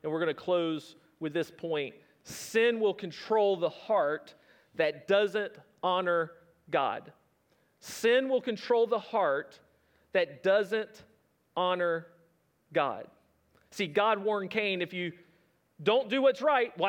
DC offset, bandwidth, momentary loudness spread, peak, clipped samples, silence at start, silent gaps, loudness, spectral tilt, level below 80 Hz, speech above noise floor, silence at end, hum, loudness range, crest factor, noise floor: under 0.1%; 18 kHz; 13 LU; -12 dBFS; under 0.1%; 0.05 s; none; -30 LUFS; -4.5 dB/octave; -80 dBFS; 41 dB; 0 s; none; 3 LU; 18 dB; -70 dBFS